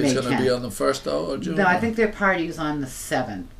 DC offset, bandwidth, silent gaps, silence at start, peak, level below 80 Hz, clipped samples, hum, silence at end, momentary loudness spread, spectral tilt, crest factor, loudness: under 0.1%; 15.5 kHz; none; 0 s; -6 dBFS; -44 dBFS; under 0.1%; none; 0.05 s; 6 LU; -5 dB/octave; 16 dB; -23 LUFS